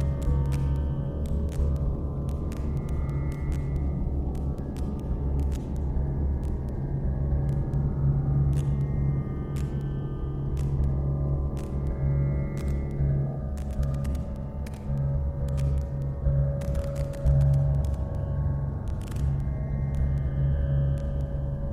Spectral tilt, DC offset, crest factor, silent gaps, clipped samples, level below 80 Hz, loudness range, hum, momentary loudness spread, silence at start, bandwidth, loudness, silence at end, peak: -9.5 dB/octave; under 0.1%; 14 dB; none; under 0.1%; -30 dBFS; 3 LU; none; 6 LU; 0 s; 9.6 kHz; -29 LUFS; 0 s; -12 dBFS